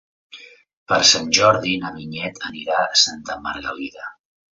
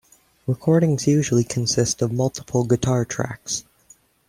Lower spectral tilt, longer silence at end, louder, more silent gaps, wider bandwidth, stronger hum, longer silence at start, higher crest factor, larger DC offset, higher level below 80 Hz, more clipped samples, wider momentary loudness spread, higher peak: second, -1.5 dB/octave vs -5.5 dB/octave; second, 0.4 s vs 0.7 s; first, -18 LUFS vs -21 LUFS; first, 0.73-0.86 s vs none; second, 8 kHz vs 15.5 kHz; neither; about the same, 0.35 s vs 0.45 s; first, 22 dB vs 16 dB; neither; about the same, -56 dBFS vs -52 dBFS; neither; first, 17 LU vs 9 LU; first, 0 dBFS vs -4 dBFS